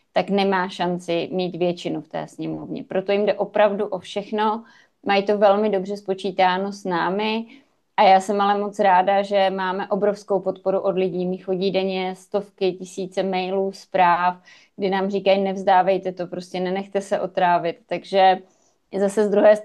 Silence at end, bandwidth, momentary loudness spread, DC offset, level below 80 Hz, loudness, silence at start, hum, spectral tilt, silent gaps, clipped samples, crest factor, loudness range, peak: 0 s; 12 kHz; 11 LU; under 0.1%; -70 dBFS; -21 LUFS; 0.15 s; none; -6 dB/octave; none; under 0.1%; 18 dB; 4 LU; -4 dBFS